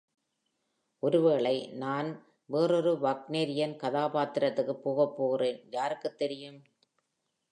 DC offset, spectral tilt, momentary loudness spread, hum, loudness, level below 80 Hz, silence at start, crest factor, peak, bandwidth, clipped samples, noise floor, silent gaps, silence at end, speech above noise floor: under 0.1%; -6.5 dB/octave; 9 LU; none; -30 LUFS; -86 dBFS; 1.05 s; 18 dB; -14 dBFS; 10.5 kHz; under 0.1%; -82 dBFS; none; 0.9 s; 52 dB